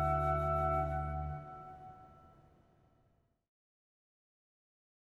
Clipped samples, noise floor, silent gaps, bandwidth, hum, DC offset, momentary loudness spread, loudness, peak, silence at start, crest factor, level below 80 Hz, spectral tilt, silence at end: under 0.1%; -74 dBFS; none; 12 kHz; none; under 0.1%; 21 LU; -35 LUFS; -22 dBFS; 0 s; 18 dB; -48 dBFS; -9 dB/octave; 2.95 s